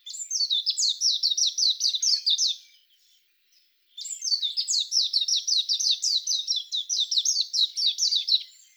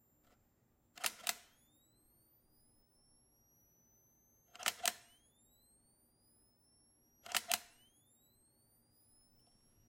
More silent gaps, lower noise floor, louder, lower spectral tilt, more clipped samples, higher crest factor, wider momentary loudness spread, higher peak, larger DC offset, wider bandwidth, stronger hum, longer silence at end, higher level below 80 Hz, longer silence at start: neither; second, -65 dBFS vs -76 dBFS; first, -22 LUFS vs -39 LUFS; second, 9.5 dB/octave vs 1.5 dB/octave; neither; second, 16 dB vs 36 dB; second, 5 LU vs 25 LU; first, -10 dBFS vs -14 dBFS; neither; first, over 20 kHz vs 16.5 kHz; neither; second, 0.25 s vs 2.2 s; second, under -90 dBFS vs -82 dBFS; second, 0.05 s vs 1 s